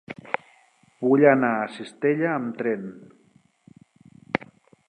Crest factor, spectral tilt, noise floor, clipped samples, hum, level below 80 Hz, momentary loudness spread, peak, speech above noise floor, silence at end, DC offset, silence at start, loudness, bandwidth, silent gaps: 24 dB; -8 dB/octave; -61 dBFS; under 0.1%; none; -72 dBFS; 15 LU; -2 dBFS; 39 dB; 0.5 s; under 0.1%; 0.1 s; -24 LUFS; 9.6 kHz; none